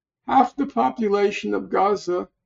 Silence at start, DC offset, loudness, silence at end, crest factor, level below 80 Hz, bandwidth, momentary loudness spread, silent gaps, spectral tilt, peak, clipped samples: 0.25 s; under 0.1%; -22 LUFS; 0.2 s; 18 dB; -60 dBFS; 7.8 kHz; 5 LU; none; -4 dB/octave; -4 dBFS; under 0.1%